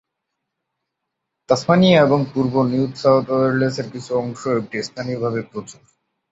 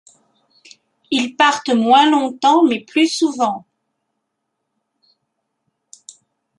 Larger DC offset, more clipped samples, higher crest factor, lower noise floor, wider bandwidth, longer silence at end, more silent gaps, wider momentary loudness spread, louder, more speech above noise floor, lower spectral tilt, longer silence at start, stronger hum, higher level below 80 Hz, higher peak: neither; neither; about the same, 18 dB vs 18 dB; first, -79 dBFS vs -75 dBFS; second, 8 kHz vs 11.5 kHz; second, 0.6 s vs 3 s; neither; first, 14 LU vs 9 LU; second, -19 LUFS vs -15 LUFS; about the same, 61 dB vs 60 dB; first, -6.5 dB/octave vs -3 dB/octave; first, 1.5 s vs 1.1 s; neither; first, -58 dBFS vs -72 dBFS; about the same, -2 dBFS vs 0 dBFS